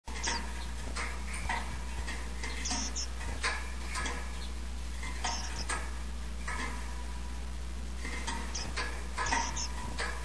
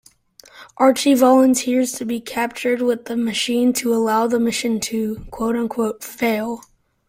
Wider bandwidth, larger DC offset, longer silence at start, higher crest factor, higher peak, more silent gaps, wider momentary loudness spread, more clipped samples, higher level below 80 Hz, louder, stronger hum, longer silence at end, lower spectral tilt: second, 11 kHz vs 16.5 kHz; first, 0.8% vs under 0.1%; second, 0 s vs 0.55 s; about the same, 20 dB vs 16 dB; second, -16 dBFS vs -2 dBFS; neither; about the same, 8 LU vs 10 LU; neither; first, -40 dBFS vs -52 dBFS; second, -37 LUFS vs -19 LUFS; neither; second, 0 s vs 0.5 s; about the same, -2.5 dB/octave vs -3.5 dB/octave